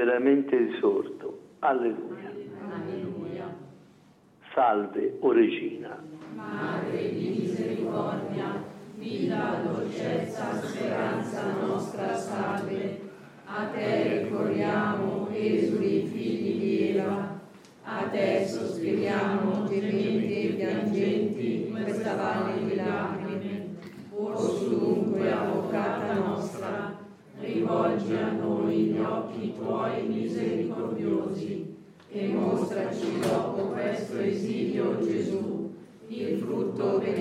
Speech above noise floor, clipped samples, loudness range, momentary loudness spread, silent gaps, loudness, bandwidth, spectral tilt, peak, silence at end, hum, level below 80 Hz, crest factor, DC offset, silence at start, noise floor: 30 dB; under 0.1%; 3 LU; 12 LU; none; -29 LUFS; 13 kHz; -7 dB/octave; -12 dBFS; 0 s; none; -76 dBFS; 18 dB; under 0.1%; 0 s; -57 dBFS